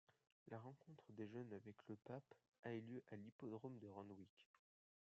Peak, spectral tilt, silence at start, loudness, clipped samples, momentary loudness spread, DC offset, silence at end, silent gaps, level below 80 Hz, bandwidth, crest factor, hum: -40 dBFS; -7 dB/octave; 0.1 s; -58 LUFS; under 0.1%; 9 LU; under 0.1%; 0.55 s; 0.32-0.46 s, 2.48-2.52 s, 2.59-2.63 s, 3.32-3.39 s, 4.30-4.37 s, 4.46-4.54 s; under -90 dBFS; 7.4 kHz; 18 dB; none